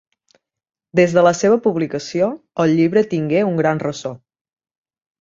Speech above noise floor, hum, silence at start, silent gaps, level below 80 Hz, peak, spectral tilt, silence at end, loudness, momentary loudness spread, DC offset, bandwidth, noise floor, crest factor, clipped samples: 45 dB; none; 0.95 s; none; -60 dBFS; 0 dBFS; -6.5 dB/octave; 1.05 s; -17 LUFS; 9 LU; under 0.1%; 7.8 kHz; -62 dBFS; 18 dB; under 0.1%